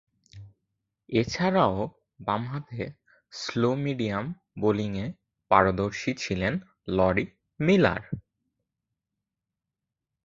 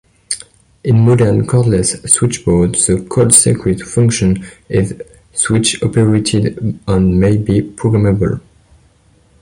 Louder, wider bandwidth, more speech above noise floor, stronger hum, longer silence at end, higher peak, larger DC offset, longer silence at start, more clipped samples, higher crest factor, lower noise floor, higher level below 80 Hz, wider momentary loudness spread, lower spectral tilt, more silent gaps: second, -27 LUFS vs -13 LUFS; second, 7.6 kHz vs 12 kHz; first, 61 dB vs 38 dB; neither; first, 2.05 s vs 1 s; about the same, -2 dBFS vs 0 dBFS; neither; about the same, 0.35 s vs 0.3 s; neither; first, 26 dB vs 14 dB; first, -87 dBFS vs -50 dBFS; second, -52 dBFS vs -34 dBFS; first, 15 LU vs 12 LU; first, -6.5 dB/octave vs -5 dB/octave; neither